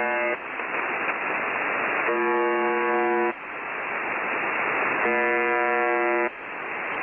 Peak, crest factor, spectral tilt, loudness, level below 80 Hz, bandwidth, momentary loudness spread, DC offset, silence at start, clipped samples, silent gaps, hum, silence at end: -12 dBFS; 14 dB; -7 dB/octave; -24 LUFS; -68 dBFS; 3.4 kHz; 7 LU; under 0.1%; 0 s; under 0.1%; none; none; 0 s